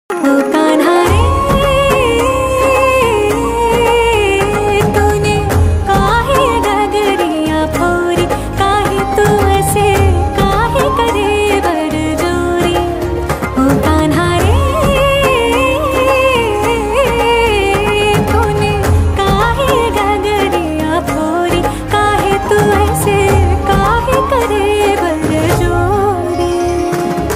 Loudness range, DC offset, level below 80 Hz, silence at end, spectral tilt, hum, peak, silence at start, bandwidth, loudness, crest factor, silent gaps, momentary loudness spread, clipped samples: 2 LU; under 0.1%; -22 dBFS; 0 s; -5.5 dB/octave; none; 0 dBFS; 0.1 s; 16 kHz; -12 LUFS; 12 dB; none; 4 LU; under 0.1%